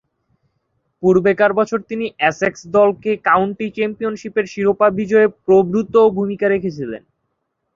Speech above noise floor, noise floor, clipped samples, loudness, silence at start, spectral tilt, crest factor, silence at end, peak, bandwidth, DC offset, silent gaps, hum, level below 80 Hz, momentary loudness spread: 56 dB; -72 dBFS; under 0.1%; -16 LUFS; 1 s; -6.5 dB/octave; 16 dB; 0.8 s; -2 dBFS; 7.4 kHz; under 0.1%; none; none; -56 dBFS; 8 LU